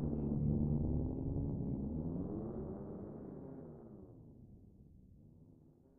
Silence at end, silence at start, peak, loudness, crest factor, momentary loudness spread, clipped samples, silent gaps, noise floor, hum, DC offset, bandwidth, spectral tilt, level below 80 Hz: 0.3 s; 0 s; -24 dBFS; -40 LUFS; 16 dB; 23 LU; under 0.1%; none; -64 dBFS; none; under 0.1%; 1.7 kHz; -13.5 dB/octave; -50 dBFS